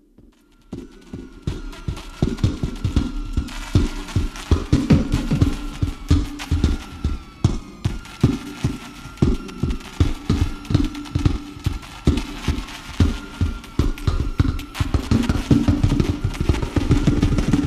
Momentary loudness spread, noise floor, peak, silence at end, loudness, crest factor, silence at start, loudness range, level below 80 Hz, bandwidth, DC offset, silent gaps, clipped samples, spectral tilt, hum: 12 LU; -51 dBFS; -2 dBFS; 0 s; -23 LUFS; 20 dB; 0.7 s; 4 LU; -26 dBFS; 14 kHz; under 0.1%; none; under 0.1%; -7 dB/octave; none